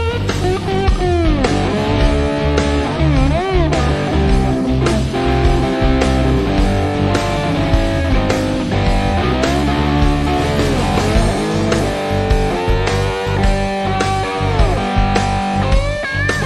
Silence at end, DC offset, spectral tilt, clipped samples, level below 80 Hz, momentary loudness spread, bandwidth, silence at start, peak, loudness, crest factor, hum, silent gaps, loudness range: 0 s; under 0.1%; -6 dB/octave; under 0.1%; -20 dBFS; 2 LU; 12.5 kHz; 0 s; 0 dBFS; -16 LUFS; 14 dB; none; none; 1 LU